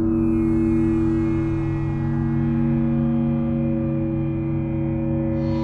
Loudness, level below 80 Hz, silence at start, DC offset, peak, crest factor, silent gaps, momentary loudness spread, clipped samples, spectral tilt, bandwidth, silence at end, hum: -22 LUFS; -34 dBFS; 0 s; under 0.1%; -10 dBFS; 12 dB; none; 4 LU; under 0.1%; -11 dB/octave; 4.6 kHz; 0 s; none